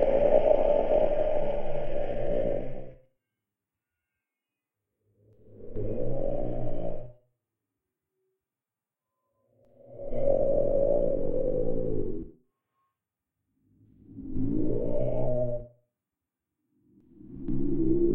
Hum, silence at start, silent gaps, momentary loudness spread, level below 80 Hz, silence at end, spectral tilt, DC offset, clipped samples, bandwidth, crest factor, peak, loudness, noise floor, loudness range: none; 0 s; none; 17 LU; -36 dBFS; 0 s; -10.5 dB/octave; under 0.1%; under 0.1%; 3.3 kHz; 20 dB; -8 dBFS; -29 LUFS; under -90 dBFS; 12 LU